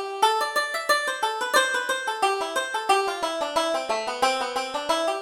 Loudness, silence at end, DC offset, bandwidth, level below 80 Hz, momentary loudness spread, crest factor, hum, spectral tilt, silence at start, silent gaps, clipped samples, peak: -24 LUFS; 0 s; under 0.1%; 18.5 kHz; -64 dBFS; 5 LU; 20 dB; none; 0 dB/octave; 0 s; none; under 0.1%; -6 dBFS